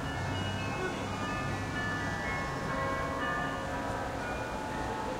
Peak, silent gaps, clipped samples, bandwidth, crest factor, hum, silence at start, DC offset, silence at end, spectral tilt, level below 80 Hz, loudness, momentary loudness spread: -20 dBFS; none; under 0.1%; 16 kHz; 14 dB; none; 0 s; under 0.1%; 0 s; -5 dB/octave; -48 dBFS; -34 LUFS; 3 LU